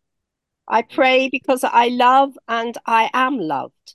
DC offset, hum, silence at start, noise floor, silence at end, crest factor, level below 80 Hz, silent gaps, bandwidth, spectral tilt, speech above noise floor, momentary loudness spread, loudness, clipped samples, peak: under 0.1%; none; 0.65 s; -79 dBFS; 0.25 s; 16 dB; -72 dBFS; none; 12.5 kHz; -3.5 dB/octave; 62 dB; 9 LU; -17 LUFS; under 0.1%; -2 dBFS